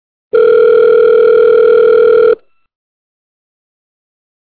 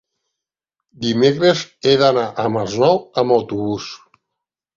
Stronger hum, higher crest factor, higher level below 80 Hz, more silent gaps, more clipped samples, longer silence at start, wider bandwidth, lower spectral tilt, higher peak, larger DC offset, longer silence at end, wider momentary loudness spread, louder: neither; second, 8 dB vs 18 dB; about the same, -52 dBFS vs -56 dBFS; neither; neither; second, 0.35 s vs 1 s; second, 4.5 kHz vs 7.6 kHz; first, -8.5 dB/octave vs -5.5 dB/octave; about the same, -2 dBFS vs -2 dBFS; first, 0.2% vs under 0.1%; first, 2.1 s vs 0.8 s; second, 5 LU vs 10 LU; first, -8 LUFS vs -17 LUFS